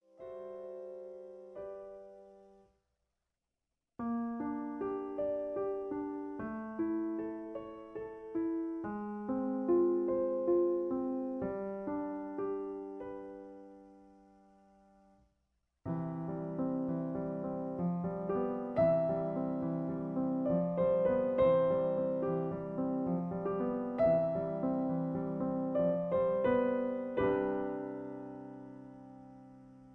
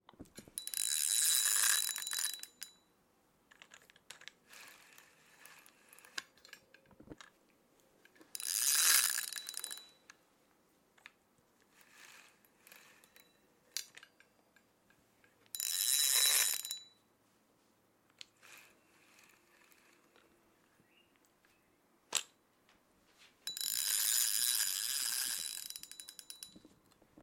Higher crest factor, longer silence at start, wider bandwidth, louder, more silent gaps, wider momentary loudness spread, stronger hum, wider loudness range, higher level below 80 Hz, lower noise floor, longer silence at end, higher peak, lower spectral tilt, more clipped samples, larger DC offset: second, 16 dB vs 28 dB; about the same, 0.2 s vs 0.2 s; second, 4.3 kHz vs 17 kHz; second, -35 LUFS vs -32 LUFS; neither; second, 17 LU vs 27 LU; neither; second, 13 LU vs 20 LU; first, -64 dBFS vs -82 dBFS; first, -89 dBFS vs -73 dBFS; second, 0 s vs 0.65 s; second, -18 dBFS vs -14 dBFS; first, -11 dB/octave vs 3 dB/octave; neither; neither